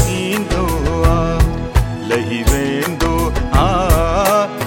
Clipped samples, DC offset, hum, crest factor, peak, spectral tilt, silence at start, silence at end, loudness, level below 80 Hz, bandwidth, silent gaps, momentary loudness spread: under 0.1%; under 0.1%; none; 14 dB; 0 dBFS; -5.5 dB/octave; 0 s; 0 s; -16 LUFS; -20 dBFS; 18 kHz; none; 5 LU